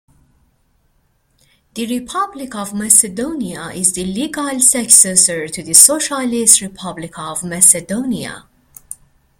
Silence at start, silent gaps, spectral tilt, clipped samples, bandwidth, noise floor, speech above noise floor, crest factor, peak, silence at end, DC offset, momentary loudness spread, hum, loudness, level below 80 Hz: 1.75 s; none; -1.5 dB/octave; 0.4%; over 20 kHz; -60 dBFS; 45 dB; 16 dB; 0 dBFS; 0.45 s; under 0.1%; 20 LU; none; -12 LUFS; -52 dBFS